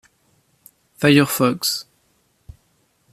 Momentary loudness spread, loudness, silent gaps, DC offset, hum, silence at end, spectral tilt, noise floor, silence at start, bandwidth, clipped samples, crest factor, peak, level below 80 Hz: 8 LU; -18 LUFS; none; under 0.1%; none; 1.3 s; -4.5 dB/octave; -63 dBFS; 1 s; 15 kHz; under 0.1%; 20 dB; -2 dBFS; -56 dBFS